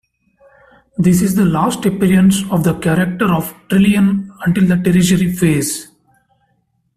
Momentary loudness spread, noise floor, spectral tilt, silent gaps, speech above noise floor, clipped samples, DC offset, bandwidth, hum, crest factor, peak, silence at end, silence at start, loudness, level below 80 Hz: 6 LU; -63 dBFS; -6 dB/octave; none; 50 dB; under 0.1%; under 0.1%; 15 kHz; none; 12 dB; -2 dBFS; 1.15 s; 1 s; -14 LUFS; -42 dBFS